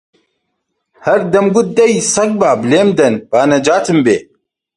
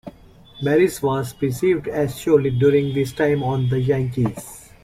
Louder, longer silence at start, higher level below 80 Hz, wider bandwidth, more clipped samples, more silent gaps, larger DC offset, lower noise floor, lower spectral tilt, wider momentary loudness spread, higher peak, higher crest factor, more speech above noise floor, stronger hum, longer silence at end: first, -12 LUFS vs -20 LUFS; first, 1.05 s vs 0.05 s; about the same, -52 dBFS vs -48 dBFS; second, 11.5 kHz vs 16 kHz; neither; neither; neither; first, -70 dBFS vs -46 dBFS; second, -4.5 dB/octave vs -7 dB/octave; second, 4 LU vs 7 LU; first, 0 dBFS vs -4 dBFS; about the same, 12 dB vs 16 dB; first, 59 dB vs 27 dB; neither; first, 0.55 s vs 0.25 s